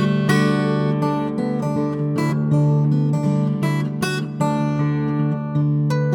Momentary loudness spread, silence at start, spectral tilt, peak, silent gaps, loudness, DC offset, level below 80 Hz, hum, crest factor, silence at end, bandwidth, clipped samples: 5 LU; 0 s; -7.5 dB/octave; -4 dBFS; none; -20 LUFS; under 0.1%; -52 dBFS; none; 14 dB; 0 s; 12 kHz; under 0.1%